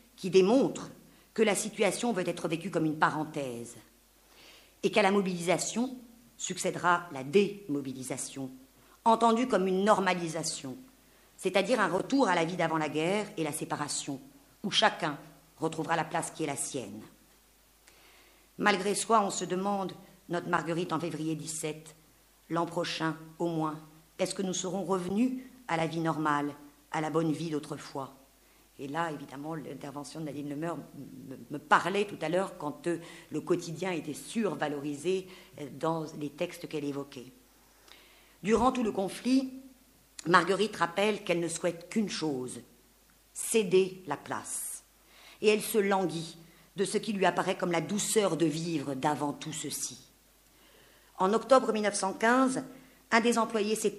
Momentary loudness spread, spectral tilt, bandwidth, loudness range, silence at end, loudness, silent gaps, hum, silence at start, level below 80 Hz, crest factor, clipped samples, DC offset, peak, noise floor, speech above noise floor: 15 LU; -4 dB/octave; 15.5 kHz; 6 LU; 0 s; -30 LUFS; none; none; 0.2 s; -66 dBFS; 24 dB; under 0.1%; under 0.1%; -6 dBFS; -63 dBFS; 33 dB